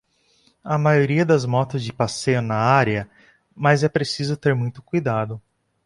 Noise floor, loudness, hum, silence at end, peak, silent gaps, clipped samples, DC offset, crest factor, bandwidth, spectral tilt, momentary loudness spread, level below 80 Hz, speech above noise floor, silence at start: -61 dBFS; -21 LUFS; none; 0.45 s; -2 dBFS; none; under 0.1%; under 0.1%; 18 dB; 11.5 kHz; -6 dB/octave; 9 LU; -54 dBFS; 41 dB; 0.65 s